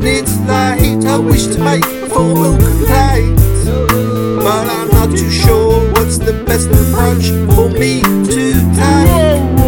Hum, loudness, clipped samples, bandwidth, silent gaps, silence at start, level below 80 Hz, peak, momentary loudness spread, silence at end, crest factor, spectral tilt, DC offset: none; -11 LUFS; 0.7%; 19.5 kHz; none; 0 s; -18 dBFS; 0 dBFS; 4 LU; 0 s; 10 dB; -5.5 dB/octave; under 0.1%